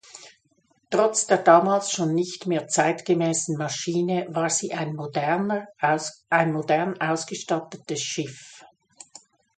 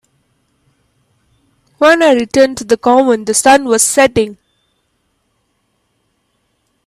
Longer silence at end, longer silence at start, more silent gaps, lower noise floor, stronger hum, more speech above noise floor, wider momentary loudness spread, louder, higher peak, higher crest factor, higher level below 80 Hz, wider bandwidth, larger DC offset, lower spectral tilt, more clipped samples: second, 0.9 s vs 2.55 s; second, 0.15 s vs 1.8 s; neither; about the same, -66 dBFS vs -63 dBFS; neither; second, 43 dB vs 53 dB; first, 9 LU vs 4 LU; second, -24 LUFS vs -10 LUFS; about the same, -2 dBFS vs 0 dBFS; first, 22 dB vs 14 dB; second, -72 dBFS vs -50 dBFS; second, 9.4 kHz vs 14.5 kHz; neither; first, -4 dB/octave vs -2.5 dB/octave; neither